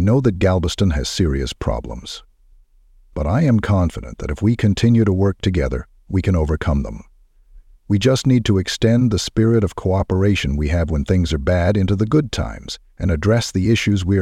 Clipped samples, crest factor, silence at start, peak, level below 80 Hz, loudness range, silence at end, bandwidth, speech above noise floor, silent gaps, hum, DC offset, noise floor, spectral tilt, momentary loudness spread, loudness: under 0.1%; 14 dB; 0 s; -2 dBFS; -30 dBFS; 4 LU; 0 s; 13 kHz; 34 dB; none; none; under 0.1%; -51 dBFS; -6.5 dB/octave; 11 LU; -18 LUFS